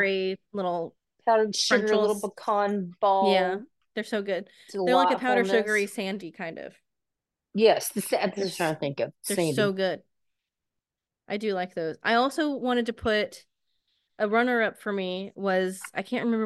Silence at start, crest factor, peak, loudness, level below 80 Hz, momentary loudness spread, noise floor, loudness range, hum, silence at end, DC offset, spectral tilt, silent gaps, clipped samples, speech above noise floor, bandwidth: 0 s; 20 dB; -8 dBFS; -26 LUFS; -64 dBFS; 13 LU; -87 dBFS; 4 LU; none; 0 s; under 0.1%; -4 dB/octave; none; under 0.1%; 61 dB; 12.5 kHz